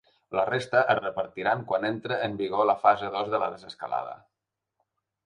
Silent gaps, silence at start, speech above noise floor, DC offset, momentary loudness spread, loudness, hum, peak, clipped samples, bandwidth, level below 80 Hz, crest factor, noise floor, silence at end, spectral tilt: none; 0.3 s; 59 dB; under 0.1%; 10 LU; -27 LUFS; none; -8 dBFS; under 0.1%; 10.5 kHz; -68 dBFS; 20 dB; -86 dBFS; 1.1 s; -6 dB/octave